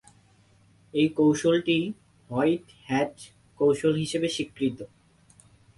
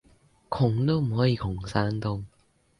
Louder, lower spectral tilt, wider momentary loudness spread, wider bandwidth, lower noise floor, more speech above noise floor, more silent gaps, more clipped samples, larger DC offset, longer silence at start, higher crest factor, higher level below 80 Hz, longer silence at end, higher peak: about the same, -26 LUFS vs -27 LUFS; second, -5.5 dB/octave vs -8 dB/octave; about the same, 11 LU vs 12 LU; about the same, 11.5 kHz vs 11 kHz; about the same, -60 dBFS vs -59 dBFS; about the same, 35 dB vs 34 dB; neither; neither; neither; first, 0.95 s vs 0.5 s; about the same, 16 dB vs 18 dB; second, -64 dBFS vs -48 dBFS; first, 0.9 s vs 0.5 s; about the same, -12 dBFS vs -10 dBFS